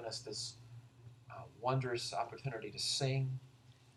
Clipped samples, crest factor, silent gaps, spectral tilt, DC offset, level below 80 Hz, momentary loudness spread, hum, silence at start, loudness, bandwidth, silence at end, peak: under 0.1%; 18 dB; none; -4 dB/octave; under 0.1%; -74 dBFS; 21 LU; none; 0 s; -39 LUFS; 12.5 kHz; 0.05 s; -22 dBFS